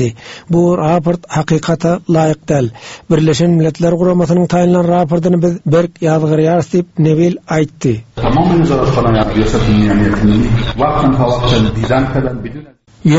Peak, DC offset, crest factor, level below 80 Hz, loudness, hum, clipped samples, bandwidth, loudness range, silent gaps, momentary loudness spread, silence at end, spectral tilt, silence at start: 0 dBFS; under 0.1%; 12 dB; -28 dBFS; -13 LUFS; none; under 0.1%; 8 kHz; 1 LU; none; 6 LU; 0 s; -7 dB/octave; 0 s